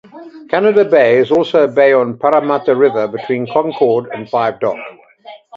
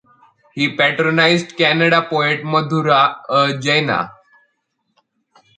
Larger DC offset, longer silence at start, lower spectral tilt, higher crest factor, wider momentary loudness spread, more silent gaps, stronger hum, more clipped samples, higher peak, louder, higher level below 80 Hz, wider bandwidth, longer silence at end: neither; second, 0.15 s vs 0.55 s; first, -7.5 dB/octave vs -5 dB/octave; about the same, 14 dB vs 18 dB; about the same, 9 LU vs 7 LU; neither; neither; neither; about the same, 0 dBFS vs 0 dBFS; about the same, -13 LUFS vs -15 LUFS; about the same, -60 dBFS vs -64 dBFS; second, 7 kHz vs 9.4 kHz; second, 0 s vs 1.45 s